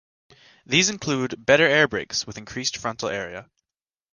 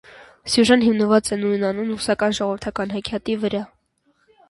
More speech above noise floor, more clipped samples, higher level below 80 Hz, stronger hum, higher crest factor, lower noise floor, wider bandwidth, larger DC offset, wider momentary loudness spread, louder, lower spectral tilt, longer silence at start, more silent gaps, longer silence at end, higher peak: first, over 67 dB vs 45 dB; neither; about the same, -56 dBFS vs -52 dBFS; neither; about the same, 22 dB vs 18 dB; first, under -90 dBFS vs -65 dBFS; about the same, 10.5 kHz vs 11.5 kHz; neither; first, 14 LU vs 11 LU; about the same, -22 LUFS vs -20 LUFS; second, -3 dB/octave vs -4.5 dB/octave; first, 0.7 s vs 0.15 s; neither; second, 0.7 s vs 0.85 s; about the same, -4 dBFS vs -2 dBFS